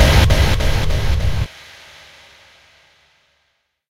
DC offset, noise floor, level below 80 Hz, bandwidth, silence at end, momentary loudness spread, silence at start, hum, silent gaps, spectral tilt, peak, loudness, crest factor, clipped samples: under 0.1%; -67 dBFS; -20 dBFS; 16 kHz; 2.45 s; 26 LU; 0 s; none; none; -5 dB/octave; 0 dBFS; -17 LUFS; 18 dB; under 0.1%